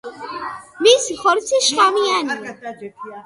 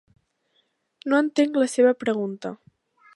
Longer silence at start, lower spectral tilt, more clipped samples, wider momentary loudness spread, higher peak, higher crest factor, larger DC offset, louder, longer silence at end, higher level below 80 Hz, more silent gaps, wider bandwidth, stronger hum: second, 0.05 s vs 1.05 s; second, -0.5 dB/octave vs -5 dB/octave; neither; first, 19 LU vs 16 LU; first, 0 dBFS vs -6 dBFS; about the same, 18 dB vs 18 dB; neither; first, -16 LUFS vs -22 LUFS; second, 0.05 s vs 0.6 s; first, -62 dBFS vs -76 dBFS; neither; about the same, 11.5 kHz vs 11.5 kHz; neither